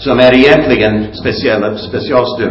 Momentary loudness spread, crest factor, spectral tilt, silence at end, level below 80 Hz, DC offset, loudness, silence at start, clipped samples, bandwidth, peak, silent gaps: 11 LU; 10 dB; -7 dB/octave; 0 s; -34 dBFS; under 0.1%; -10 LUFS; 0 s; 0.4%; 8 kHz; 0 dBFS; none